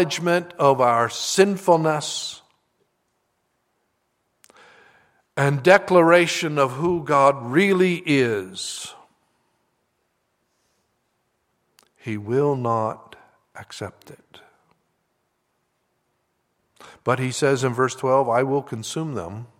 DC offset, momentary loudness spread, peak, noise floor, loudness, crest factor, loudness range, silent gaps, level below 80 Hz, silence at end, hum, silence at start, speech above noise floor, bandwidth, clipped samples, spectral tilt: under 0.1%; 17 LU; 0 dBFS; -72 dBFS; -20 LUFS; 22 dB; 20 LU; none; -66 dBFS; 0.15 s; none; 0 s; 52 dB; 16 kHz; under 0.1%; -5 dB/octave